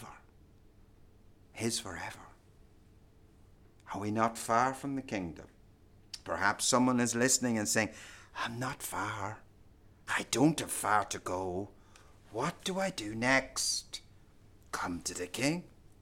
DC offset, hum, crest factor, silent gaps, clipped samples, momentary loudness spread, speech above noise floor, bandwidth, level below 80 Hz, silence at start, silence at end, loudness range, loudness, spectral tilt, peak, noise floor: under 0.1%; none; 22 dB; none; under 0.1%; 18 LU; 27 dB; 17 kHz; -62 dBFS; 0 s; 0.35 s; 8 LU; -33 LUFS; -3 dB/octave; -12 dBFS; -60 dBFS